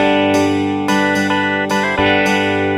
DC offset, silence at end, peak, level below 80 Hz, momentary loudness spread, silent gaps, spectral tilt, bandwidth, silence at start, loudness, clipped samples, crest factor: under 0.1%; 0 s; 0 dBFS; -46 dBFS; 3 LU; none; -5 dB/octave; 15 kHz; 0 s; -15 LUFS; under 0.1%; 14 dB